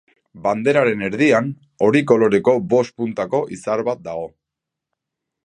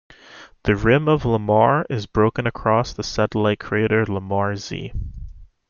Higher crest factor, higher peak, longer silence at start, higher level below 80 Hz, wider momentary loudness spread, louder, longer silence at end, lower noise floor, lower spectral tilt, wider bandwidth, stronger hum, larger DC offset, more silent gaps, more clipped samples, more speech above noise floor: about the same, 18 dB vs 18 dB; about the same, -2 dBFS vs -2 dBFS; about the same, 0.35 s vs 0.3 s; second, -60 dBFS vs -38 dBFS; about the same, 12 LU vs 13 LU; about the same, -18 LUFS vs -20 LUFS; first, 1.15 s vs 0.25 s; first, -84 dBFS vs -45 dBFS; about the same, -6.5 dB/octave vs -6.5 dB/octave; first, 10 kHz vs 7.2 kHz; neither; neither; neither; neither; first, 66 dB vs 26 dB